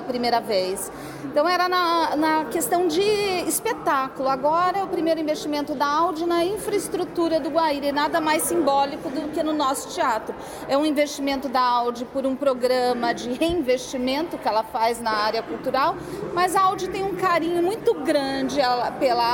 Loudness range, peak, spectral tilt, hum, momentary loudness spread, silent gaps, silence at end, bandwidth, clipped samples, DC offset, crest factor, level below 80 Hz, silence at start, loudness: 2 LU; -8 dBFS; -3.5 dB/octave; none; 6 LU; none; 0 s; 17 kHz; under 0.1%; under 0.1%; 14 dB; -54 dBFS; 0 s; -23 LUFS